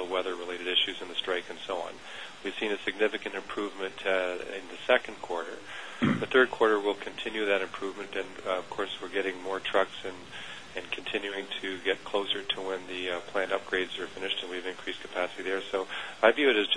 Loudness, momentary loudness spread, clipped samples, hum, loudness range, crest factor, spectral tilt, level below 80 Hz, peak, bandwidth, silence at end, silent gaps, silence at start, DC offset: -30 LUFS; 12 LU; under 0.1%; none; 5 LU; 26 dB; -4 dB/octave; -66 dBFS; -6 dBFS; 10.5 kHz; 0 s; none; 0 s; 0.4%